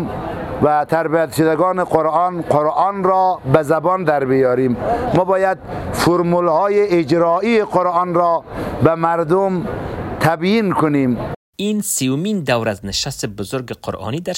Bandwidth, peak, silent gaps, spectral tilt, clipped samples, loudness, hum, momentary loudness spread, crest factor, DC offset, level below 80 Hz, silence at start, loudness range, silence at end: 16.5 kHz; 0 dBFS; 11.36-11.53 s; -5.5 dB/octave; under 0.1%; -17 LUFS; none; 10 LU; 16 dB; under 0.1%; -44 dBFS; 0 s; 3 LU; 0 s